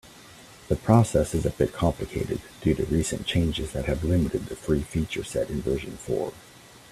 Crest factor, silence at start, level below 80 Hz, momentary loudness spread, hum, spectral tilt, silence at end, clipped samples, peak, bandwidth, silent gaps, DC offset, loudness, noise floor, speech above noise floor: 22 dB; 0.05 s; -40 dBFS; 10 LU; none; -6 dB/octave; 0.15 s; under 0.1%; -4 dBFS; 14.5 kHz; none; under 0.1%; -26 LUFS; -48 dBFS; 23 dB